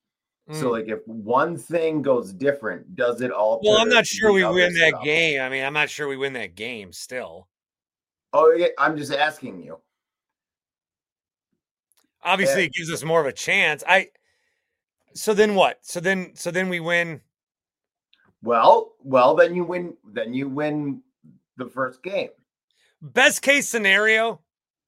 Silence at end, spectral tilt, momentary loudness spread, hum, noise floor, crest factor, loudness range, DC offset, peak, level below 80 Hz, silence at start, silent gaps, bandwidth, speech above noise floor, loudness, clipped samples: 0.5 s; -3.5 dB/octave; 16 LU; none; under -90 dBFS; 22 dB; 8 LU; under 0.1%; -2 dBFS; -64 dBFS; 0.5 s; 11.12-11.16 s, 11.71-11.75 s, 22.63-22.68 s; 16.5 kHz; over 69 dB; -20 LUFS; under 0.1%